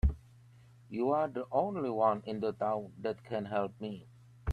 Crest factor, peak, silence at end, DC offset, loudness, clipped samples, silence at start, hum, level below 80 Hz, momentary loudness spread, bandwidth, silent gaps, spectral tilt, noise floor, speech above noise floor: 18 dB; -16 dBFS; 0 s; under 0.1%; -34 LUFS; under 0.1%; 0.05 s; none; -44 dBFS; 13 LU; 9.2 kHz; none; -9 dB/octave; -58 dBFS; 25 dB